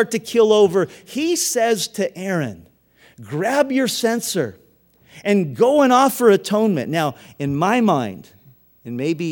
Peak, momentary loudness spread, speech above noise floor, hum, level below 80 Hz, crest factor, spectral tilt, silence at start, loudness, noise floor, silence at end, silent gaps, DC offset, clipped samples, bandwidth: -2 dBFS; 13 LU; 37 dB; none; -64 dBFS; 18 dB; -4.5 dB/octave; 0 s; -18 LUFS; -55 dBFS; 0 s; none; under 0.1%; under 0.1%; 20 kHz